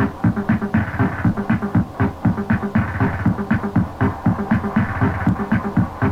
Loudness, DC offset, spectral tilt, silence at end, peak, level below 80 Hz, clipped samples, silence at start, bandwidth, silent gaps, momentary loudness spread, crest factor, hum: -20 LUFS; under 0.1%; -9 dB/octave; 0 s; -4 dBFS; -36 dBFS; under 0.1%; 0 s; 8.4 kHz; none; 2 LU; 16 dB; none